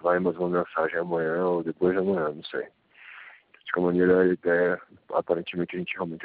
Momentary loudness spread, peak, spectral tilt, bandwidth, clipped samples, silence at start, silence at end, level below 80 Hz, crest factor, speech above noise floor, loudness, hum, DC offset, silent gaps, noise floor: 16 LU; -8 dBFS; -5.5 dB/octave; 4.8 kHz; under 0.1%; 0.05 s; 0 s; -64 dBFS; 18 dB; 24 dB; -26 LUFS; none; under 0.1%; none; -50 dBFS